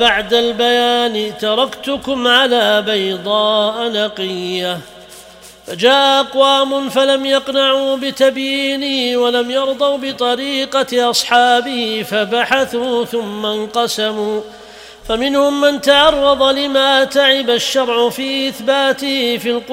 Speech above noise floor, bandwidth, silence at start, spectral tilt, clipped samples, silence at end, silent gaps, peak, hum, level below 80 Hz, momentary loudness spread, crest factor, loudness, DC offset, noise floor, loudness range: 25 dB; 16 kHz; 0 s; -2.5 dB/octave; under 0.1%; 0 s; none; 0 dBFS; none; -48 dBFS; 8 LU; 14 dB; -14 LUFS; under 0.1%; -39 dBFS; 5 LU